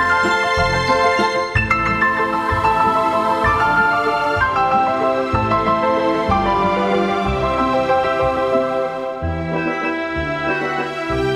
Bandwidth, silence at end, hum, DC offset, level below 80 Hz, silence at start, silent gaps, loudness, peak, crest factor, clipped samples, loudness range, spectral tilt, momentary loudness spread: 13.5 kHz; 0 s; none; under 0.1%; -36 dBFS; 0 s; none; -17 LUFS; -2 dBFS; 16 dB; under 0.1%; 3 LU; -5.5 dB/octave; 6 LU